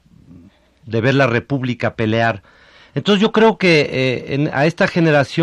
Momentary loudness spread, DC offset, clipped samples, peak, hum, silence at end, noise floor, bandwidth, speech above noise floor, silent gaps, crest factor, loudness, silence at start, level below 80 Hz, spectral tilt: 9 LU; under 0.1%; under 0.1%; -2 dBFS; none; 0 s; -47 dBFS; 10.5 kHz; 31 dB; none; 14 dB; -16 LUFS; 0.85 s; -52 dBFS; -6.5 dB/octave